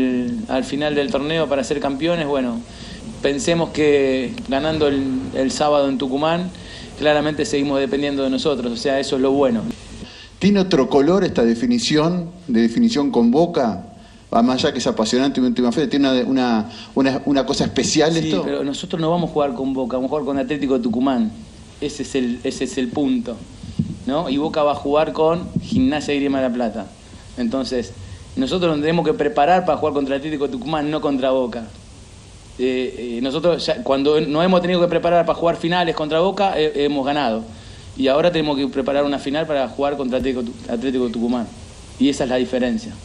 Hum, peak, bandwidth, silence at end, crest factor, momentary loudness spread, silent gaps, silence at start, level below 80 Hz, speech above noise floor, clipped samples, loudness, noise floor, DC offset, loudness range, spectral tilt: none; -2 dBFS; 11 kHz; 0 s; 16 dB; 9 LU; none; 0 s; -44 dBFS; 22 dB; under 0.1%; -19 LUFS; -41 dBFS; under 0.1%; 4 LU; -5.5 dB/octave